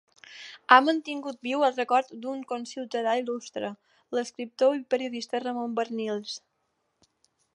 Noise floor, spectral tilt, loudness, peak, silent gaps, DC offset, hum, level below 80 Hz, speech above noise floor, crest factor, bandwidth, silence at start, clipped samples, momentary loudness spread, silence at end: -76 dBFS; -3.5 dB/octave; -27 LUFS; -2 dBFS; none; under 0.1%; none; -84 dBFS; 49 dB; 26 dB; 11 kHz; 0.3 s; under 0.1%; 17 LU; 1.15 s